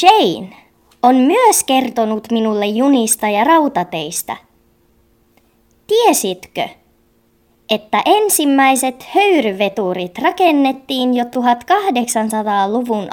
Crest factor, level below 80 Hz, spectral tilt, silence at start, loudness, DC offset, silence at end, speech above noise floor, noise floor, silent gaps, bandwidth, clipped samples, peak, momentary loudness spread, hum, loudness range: 16 dB; -60 dBFS; -3 dB/octave; 0 s; -14 LUFS; under 0.1%; 0 s; 42 dB; -56 dBFS; none; 19 kHz; under 0.1%; 0 dBFS; 10 LU; none; 6 LU